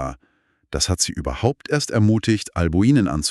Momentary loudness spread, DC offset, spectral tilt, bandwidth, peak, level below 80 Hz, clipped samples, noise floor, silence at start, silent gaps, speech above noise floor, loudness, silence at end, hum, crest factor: 6 LU; under 0.1%; -5 dB/octave; 13 kHz; -4 dBFS; -36 dBFS; under 0.1%; -63 dBFS; 0 s; none; 44 dB; -20 LUFS; 0 s; none; 16 dB